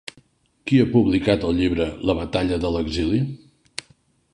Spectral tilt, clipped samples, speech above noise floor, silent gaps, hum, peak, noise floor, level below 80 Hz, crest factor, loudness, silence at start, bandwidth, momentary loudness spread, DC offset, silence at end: -7 dB/octave; under 0.1%; 39 dB; none; none; -4 dBFS; -59 dBFS; -38 dBFS; 18 dB; -21 LUFS; 0.65 s; 11 kHz; 18 LU; under 0.1%; 0.95 s